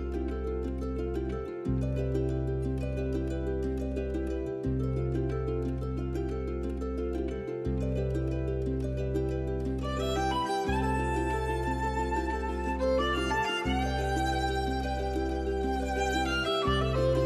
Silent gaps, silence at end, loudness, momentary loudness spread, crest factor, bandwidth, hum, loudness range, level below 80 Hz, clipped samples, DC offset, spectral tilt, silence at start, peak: none; 0 s; -31 LUFS; 6 LU; 14 dB; 13 kHz; none; 3 LU; -36 dBFS; under 0.1%; under 0.1%; -6.5 dB/octave; 0 s; -16 dBFS